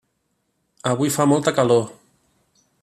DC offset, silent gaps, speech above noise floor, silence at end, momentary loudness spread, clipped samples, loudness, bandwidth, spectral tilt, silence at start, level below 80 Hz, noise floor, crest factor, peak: under 0.1%; none; 53 dB; 0.9 s; 10 LU; under 0.1%; -19 LUFS; 14.5 kHz; -5.5 dB/octave; 0.85 s; -64 dBFS; -71 dBFS; 18 dB; -4 dBFS